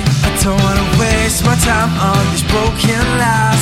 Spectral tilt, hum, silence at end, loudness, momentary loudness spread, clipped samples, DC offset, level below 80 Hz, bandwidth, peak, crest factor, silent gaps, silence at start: -4.5 dB/octave; none; 0 s; -13 LUFS; 2 LU; under 0.1%; under 0.1%; -24 dBFS; 16.5 kHz; 0 dBFS; 12 dB; none; 0 s